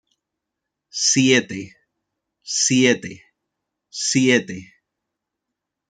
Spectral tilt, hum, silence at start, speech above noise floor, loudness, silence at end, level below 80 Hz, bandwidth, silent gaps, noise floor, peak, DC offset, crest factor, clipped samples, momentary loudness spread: -3 dB/octave; none; 0.95 s; 64 dB; -18 LUFS; 1.25 s; -66 dBFS; 9.4 kHz; none; -82 dBFS; -2 dBFS; under 0.1%; 20 dB; under 0.1%; 20 LU